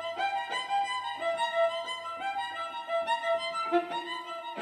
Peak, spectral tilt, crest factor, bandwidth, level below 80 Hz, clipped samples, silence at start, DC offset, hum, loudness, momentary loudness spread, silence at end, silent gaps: -14 dBFS; -2 dB/octave; 16 dB; 13 kHz; -80 dBFS; under 0.1%; 0 s; under 0.1%; none; -31 LUFS; 7 LU; 0 s; none